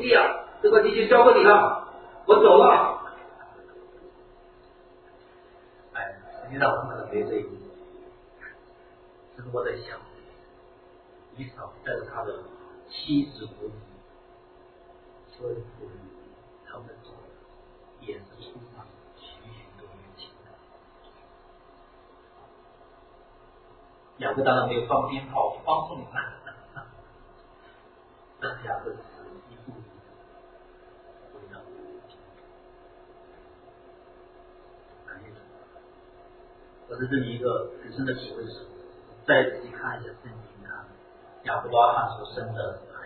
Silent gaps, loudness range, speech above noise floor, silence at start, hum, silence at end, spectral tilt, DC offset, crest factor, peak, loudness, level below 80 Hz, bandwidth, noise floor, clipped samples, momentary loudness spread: none; 25 LU; 31 dB; 0 s; none; 0 s; -9 dB/octave; under 0.1%; 26 dB; -2 dBFS; -23 LUFS; -60 dBFS; 4.5 kHz; -54 dBFS; under 0.1%; 28 LU